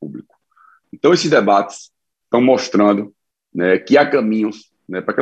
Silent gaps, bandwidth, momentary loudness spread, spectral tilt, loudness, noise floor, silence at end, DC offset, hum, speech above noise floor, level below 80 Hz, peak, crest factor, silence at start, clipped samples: none; 8.8 kHz; 17 LU; -5.5 dB/octave; -15 LUFS; -53 dBFS; 0 s; under 0.1%; none; 38 dB; -66 dBFS; -2 dBFS; 16 dB; 0 s; under 0.1%